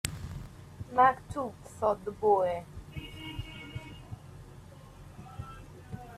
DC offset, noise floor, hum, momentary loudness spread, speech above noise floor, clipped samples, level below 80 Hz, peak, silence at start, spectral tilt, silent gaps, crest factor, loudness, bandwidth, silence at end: under 0.1%; -50 dBFS; none; 25 LU; 22 dB; under 0.1%; -52 dBFS; -8 dBFS; 0.05 s; -5 dB/octave; none; 26 dB; -31 LUFS; 15.5 kHz; 0 s